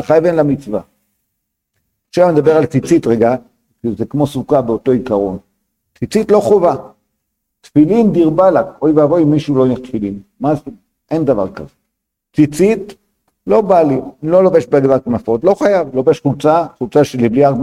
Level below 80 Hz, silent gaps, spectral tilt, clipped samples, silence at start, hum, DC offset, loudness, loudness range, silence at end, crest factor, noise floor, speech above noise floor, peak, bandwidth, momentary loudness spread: -46 dBFS; none; -8 dB/octave; under 0.1%; 0 s; none; under 0.1%; -13 LUFS; 4 LU; 0 s; 14 dB; -74 dBFS; 62 dB; 0 dBFS; 13.5 kHz; 11 LU